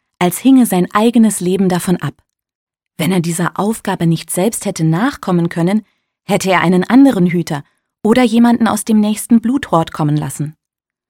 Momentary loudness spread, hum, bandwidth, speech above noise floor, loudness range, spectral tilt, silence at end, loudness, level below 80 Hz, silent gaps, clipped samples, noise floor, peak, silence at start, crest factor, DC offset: 9 LU; none; 17 kHz; 69 dB; 5 LU; -6 dB/octave; 0.6 s; -14 LUFS; -52 dBFS; 2.55-2.67 s; under 0.1%; -82 dBFS; 0 dBFS; 0.2 s; 14 dB; under 0.1%